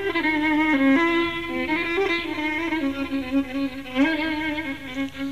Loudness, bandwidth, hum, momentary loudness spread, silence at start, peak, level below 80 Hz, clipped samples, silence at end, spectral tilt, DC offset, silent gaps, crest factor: -23 LUFS; 15 kHz; none; 10 LU; 0 s; -10 dBFS; -50 dBFS; under 0.1%; 0 s; -5 dB/octave; 0.6%; none; 14 dB